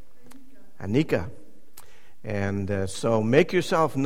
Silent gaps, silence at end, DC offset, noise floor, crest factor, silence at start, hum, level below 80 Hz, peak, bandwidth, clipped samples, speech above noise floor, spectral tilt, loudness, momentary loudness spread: none; 0 s; 2%; -53 dBFS; 22 dB; 0.8 s; none; -54 dBFS; -4 dBFS; 16.5 kHz; under 0.1%; 30 dB; -6.5 dB/octave; -25 LUFS; 16 LU